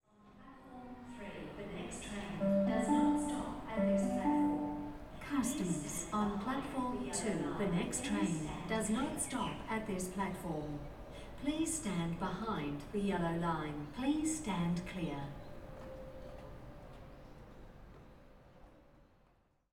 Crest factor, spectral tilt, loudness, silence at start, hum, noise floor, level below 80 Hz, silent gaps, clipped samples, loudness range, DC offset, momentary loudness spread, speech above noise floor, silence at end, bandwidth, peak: 18 dB; -5 dB/octave; -37 LUFS; 0.25 s; none; -71 dBFS; -56 dBFS; none; under 0.1%; 14 LU; under 0.1%; 19 LU; 34 dB; 0.7 s; 16.5 kHz; -20 dBFS